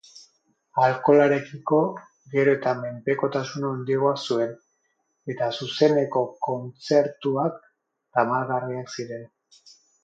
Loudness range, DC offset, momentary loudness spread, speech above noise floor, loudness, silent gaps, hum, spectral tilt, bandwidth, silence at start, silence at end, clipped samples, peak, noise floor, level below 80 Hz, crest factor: 4 LU; under 0.1%; 12 LU; 50 dB; -24 LUFS; none; none; -6 dB/octave; 7.8 kHz; 0.15 s; 0.75 s; under 0.1%; -6 dBFS; -73 dBFS; -74 dBFS; 18 dB